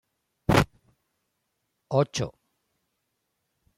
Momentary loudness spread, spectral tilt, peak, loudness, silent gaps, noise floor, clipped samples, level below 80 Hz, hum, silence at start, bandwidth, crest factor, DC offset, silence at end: 10 LU; -5.5 dB/octave; -8 dBFS; -26 LUFS; none; -79 dBFS; under 0.1%; -48 dBFS; none; 0.5 s; 16.5 kHz; 22 dB; under 0.1%; 1.45 s